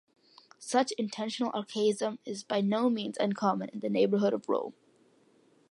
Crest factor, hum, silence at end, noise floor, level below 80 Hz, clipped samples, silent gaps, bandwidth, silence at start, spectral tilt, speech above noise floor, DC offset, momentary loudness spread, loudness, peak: 18 dB; none; 1 s; -65 dBFS; -84 dBFS; under 0.1%; none; 11.5 kHz; 0.6 s; -5 dB/octave; 35 dB; under 0.1%; 7 LU; -30 LUFS; -12 dBFS